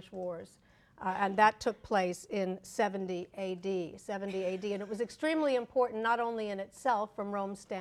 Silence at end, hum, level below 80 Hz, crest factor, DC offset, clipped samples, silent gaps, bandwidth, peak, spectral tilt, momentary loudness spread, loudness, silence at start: 0 s; none; -68 dBFS; 22 dB; under 0.1%; under 0.1%; none; 14 kHz; -12 dBFS; -5 dB/octave; 10 LU; -34 LUFS; 0 s